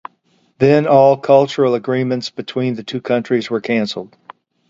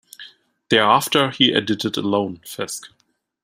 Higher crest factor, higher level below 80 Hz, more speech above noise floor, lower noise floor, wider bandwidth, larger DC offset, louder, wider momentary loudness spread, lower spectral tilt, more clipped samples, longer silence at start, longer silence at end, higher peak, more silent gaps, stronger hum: about the same, 16 dB vs 20 dB; about the same, -60 dBFS vs -62 dBFS; first, 44 dB vs 26 dB; first, -59 dBFS vs -45 dBFS; second, 7.8 kHz vs 16 kHz; neither; first, -16 LUFS vs -19 LUFS; second, 12 LU vs 16 LU; first, -7 dB/octave vs -3.5 dB/octave; neither; first, 0.6 s vs 0.2 s; about the same, 0.65 s vs 0.55 s; about the same, 0 dBFS vs -2 dBFS; neither; neither